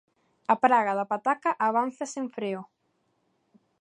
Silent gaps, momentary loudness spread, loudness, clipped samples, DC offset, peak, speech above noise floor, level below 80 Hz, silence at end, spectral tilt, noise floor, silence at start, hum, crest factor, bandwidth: none; 12 LU; -26 LUFS; under 0.1%; under 0.1%; -6 dBFS; 47 dB; -80 dBFS; 1.15 s; -5 dB/octave; -73 dBFS; 0.5 s; none; 22 dB; 11 kHz